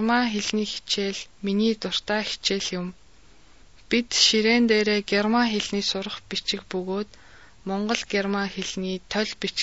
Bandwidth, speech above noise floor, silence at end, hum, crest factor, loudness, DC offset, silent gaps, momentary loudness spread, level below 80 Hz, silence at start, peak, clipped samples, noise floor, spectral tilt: 8 kHz; 30 dB; 0 s; none; 20 dB; -24 LUFS; 0.3%; none; 11 LU; -56 dBFS; 0 s; -4 dBFS; under 0.1%; -55 dBFS; -3.5 dB/octave